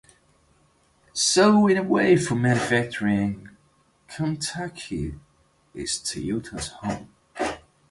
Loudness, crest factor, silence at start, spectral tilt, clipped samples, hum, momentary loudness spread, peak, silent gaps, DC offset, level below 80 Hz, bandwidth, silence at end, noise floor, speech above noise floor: -23 LUFS; 20 dB; 1.15 s; -4.5 dB/octave; under 0.1%; none; 17 LU; -6 dBFS; none; under 0.1%; -50 dBFS; 11.5 kHz; 0.35 s; -62 dBFS; 40 dB